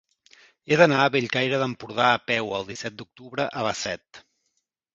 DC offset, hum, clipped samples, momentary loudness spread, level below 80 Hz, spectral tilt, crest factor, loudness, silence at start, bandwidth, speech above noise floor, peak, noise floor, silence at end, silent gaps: under 0.1%; none; under 0.1%; 16 LU; -64 dBFS; -4.5 dB/octave; 24 dB; -23 LUFS; 0.7 s; 7.8 kHz; 52 dB; -2 dBFS; -76 dBFS; 0.75 s; none